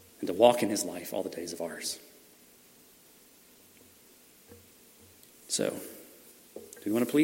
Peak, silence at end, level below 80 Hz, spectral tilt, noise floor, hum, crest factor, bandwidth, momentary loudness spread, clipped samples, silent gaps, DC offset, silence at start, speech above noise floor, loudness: -6 dBFS; 0 s; -78 dBFS; -3.5 dB/octave; -58 dBFS; none; 26 dB; 16.5 kHz; 26 LU; under 0.1%; none; under 0.1%; 0.2 s; 30 dB; -30 LUFS